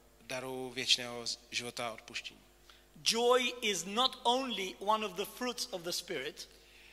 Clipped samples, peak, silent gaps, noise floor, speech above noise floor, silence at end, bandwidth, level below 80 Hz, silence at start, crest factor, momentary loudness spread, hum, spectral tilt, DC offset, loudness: under 0.1%; -14 dBFS; none; -61 dBFS; 25 dB; 0 s; 16 kHz; -68 dBFS; 0.3 s; 22 dB; 13 LU; none; -1.5 dB/octave; under 0.1%; -34 LUFS